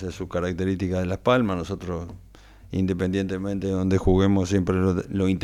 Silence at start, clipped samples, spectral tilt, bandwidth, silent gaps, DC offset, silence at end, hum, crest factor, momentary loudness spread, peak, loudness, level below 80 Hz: 0 s; under 0.1%; -7.5 dB/octave; 11 kHz; none; under 0.1%; 0 s; none; 18 dB; 10 LU; -6 dBFS; -24 LUFS; -42 dBFS